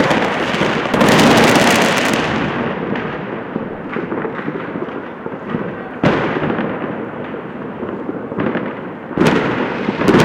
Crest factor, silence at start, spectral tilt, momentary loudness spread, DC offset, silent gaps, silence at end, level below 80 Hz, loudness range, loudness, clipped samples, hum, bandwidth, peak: 16 dB; 0 s; -5 dB/octave; 15 LU; under 0.1%; none; 0 s; -44 dBFS; 9 LU; -17 LUFS; under 0.1%; none; 17 kHz; 0 dBFS